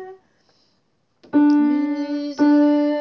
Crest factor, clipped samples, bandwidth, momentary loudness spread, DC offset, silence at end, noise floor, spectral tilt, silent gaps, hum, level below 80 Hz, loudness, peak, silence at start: 12 dB; under 0.1%; 6.4 kHz; 8 LU; under 0.1%; 0 s; -67 dBFS; -6 dB/octave; none; none; -74 dBFS; -18 LUFS; -8 dBFS; 0 s